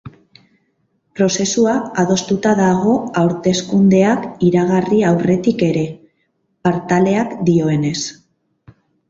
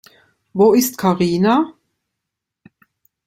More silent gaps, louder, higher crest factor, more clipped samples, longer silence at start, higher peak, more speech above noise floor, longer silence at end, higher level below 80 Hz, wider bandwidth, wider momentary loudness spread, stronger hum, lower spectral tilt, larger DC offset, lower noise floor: neither; about the same, -16 LUFS vs -16 LUFS; about the same, 14 dB vs 16 dB; neither; second, 0.05 s vs 0.55 s; about the same, -2 dBFS vs -2 dBFS; second, 51 dB vs 66 dB; second, 0.95 s vs 1.55 s; first, -52 dBFS vs -58 dBFS; second, 7.8 kHz vs 16.5 kHz; second, 6 LU vs 10 LU; neither; about the same, -6 dB/octave vs -5.5 dB/octave; neither; second, -66 dBFS vs -81 dBFS